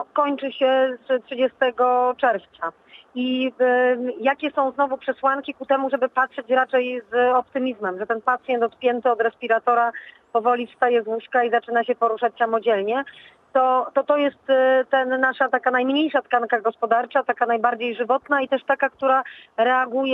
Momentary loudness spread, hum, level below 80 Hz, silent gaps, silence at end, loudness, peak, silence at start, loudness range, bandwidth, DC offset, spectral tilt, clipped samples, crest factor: 6 LU; none; -74 dBFS; none; 0 s; -21 LUFS; -4 dBFS; 0 s; 2 LU; 4.1 kHz; under 0.1%; -6 dB/octave; under 0.1%; 16 dB